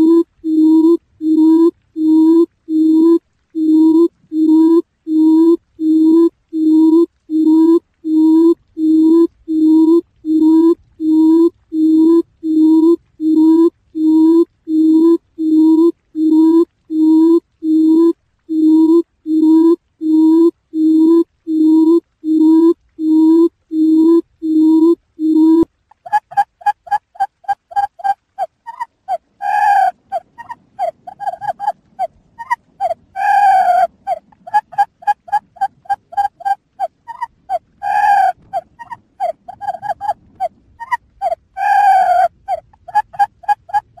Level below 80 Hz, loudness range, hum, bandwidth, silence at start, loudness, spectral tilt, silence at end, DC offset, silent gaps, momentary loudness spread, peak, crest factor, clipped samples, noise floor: -58 dBFS; 7 LU; none; 5 kHz; 0 s; -13 LUFS; -6 dB/octave; 0.2 s; under 0.1%; none; 14 LU; -2 dBFS; 10 dB; under 0.1%; -38 dBFS